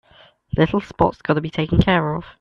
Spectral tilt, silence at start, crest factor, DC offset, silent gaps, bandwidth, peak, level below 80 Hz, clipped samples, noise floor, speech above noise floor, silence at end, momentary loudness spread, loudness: -8 dB/octave; 0.55 s; 18 dB; under 0.1%; none; 7 kHz; -2 dBFS; -36 dBFS; under 0.1%; -52 dBFS; 33 dB; 0.1 s; 6 LU; -20 LUFS